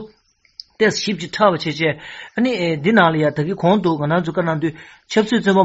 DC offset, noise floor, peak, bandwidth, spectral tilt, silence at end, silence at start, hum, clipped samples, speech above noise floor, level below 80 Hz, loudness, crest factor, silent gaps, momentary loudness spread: under 0.1%; -56 dBFS; 0 dBFS; 8 kHz; -4.5 dB/octave; 0 s; 0 s; none; under 0.1%; 39 dB; -56 dBFS; -18 LUFS; 18 dB; none; 9 LU